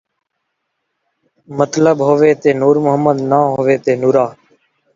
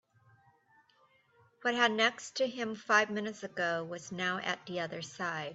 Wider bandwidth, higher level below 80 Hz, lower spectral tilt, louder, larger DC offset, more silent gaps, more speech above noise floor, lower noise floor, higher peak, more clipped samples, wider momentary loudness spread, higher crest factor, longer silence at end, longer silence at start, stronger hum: about the same, 7.6 kHz vs 8.2 kHz; first, -58 dBFS vs -82 dBFS; first, -7 dB/octave vs -3 dB/octave; first, -13 LUFS vs -33 LUFS; neither; neither; first, 60 dB vs 35 dB; first, -72 dBFS vs -68 dBFS; first, 0 dBFS vs -12 dBFS; neither; second, 6 LU vs 10 LU; second, 14 dB vs 22 dB; first, 0.65 s vs 0 s; second, 1.5 s vs 1.65 s; neither